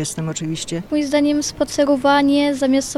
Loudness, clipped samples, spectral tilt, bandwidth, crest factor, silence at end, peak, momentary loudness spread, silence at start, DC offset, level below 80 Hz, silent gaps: -18 LUFS; under 0.1%; -4.5 dB/octave; 13 kHz; 14 dB; 0 s; -4 dBFS; 9 LU; 0 s; under 0.1%; -48 dBFS; none